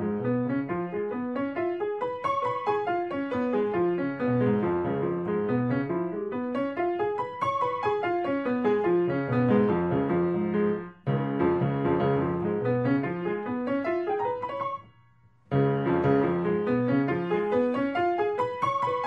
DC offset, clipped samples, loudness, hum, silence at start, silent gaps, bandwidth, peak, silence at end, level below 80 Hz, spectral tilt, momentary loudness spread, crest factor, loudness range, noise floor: under 0.1%; under 0.1%; -27 LUFS; none; 0 s; none; 6 kHz; -10 dBFS; 0 s; -60 dBFS; -9 dB/octave; 6 LU; 16 dB; 3 LU; -60 dBFS